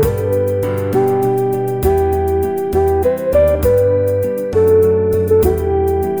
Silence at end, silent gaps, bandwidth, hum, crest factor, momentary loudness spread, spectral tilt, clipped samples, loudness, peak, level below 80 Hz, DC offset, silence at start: 0 s; none; over 20 kHz; none; 12 dB; 5 LU; -8 dB/octave; under 0.1%; -15 LUFS; -2 dBFS; -28 dBFS; under 0.1%; 0 s